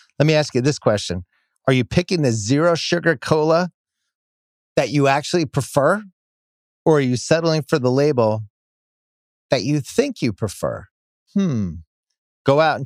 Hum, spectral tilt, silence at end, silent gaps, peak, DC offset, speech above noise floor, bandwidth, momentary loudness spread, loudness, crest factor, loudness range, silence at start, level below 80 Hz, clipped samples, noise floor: none; -5.5 dB/octave; 0 s; 3.74-3.85 s, 4.15-4.76 s, 6.13-6.85 s, 8.50-9.49 s, 10.91-11.26 s, 11.87-12.03 s, 12.18-12.45 s; 0 dBFS; under 0.1%; over 72 dB; 15.5 kHz; 9 LU; -19 LUFS; 18 dB; 4 LU; 0.2 s; -52 dBFS; under 0.1%; under -90 dBFS